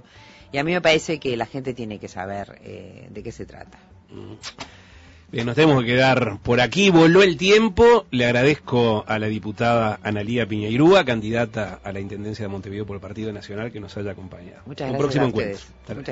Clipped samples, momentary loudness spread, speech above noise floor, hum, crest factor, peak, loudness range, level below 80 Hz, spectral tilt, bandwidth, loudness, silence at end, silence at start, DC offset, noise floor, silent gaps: under 0.1%; 21 LU; 27 dB; none; 16 dB; -4 dBFS; 16 LU; -46 dBFS; -5.5 dB/octave; 8 kHz; -19 LUFS; 0 s; 0.55 s; under 0.1%; -47 dBFS; none